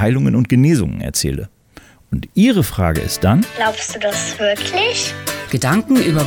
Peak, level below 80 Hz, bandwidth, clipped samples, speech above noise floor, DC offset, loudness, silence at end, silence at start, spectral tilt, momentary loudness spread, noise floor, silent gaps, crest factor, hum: -4 dBFS; -36 dBFS; over 20 kHz; under 0.1%; 29 dB; under 0.1%; -16 LUFS; 0 s; 0 s; -5 dB/octave; 8 LU; -44 dBFS; none; 12 dB; none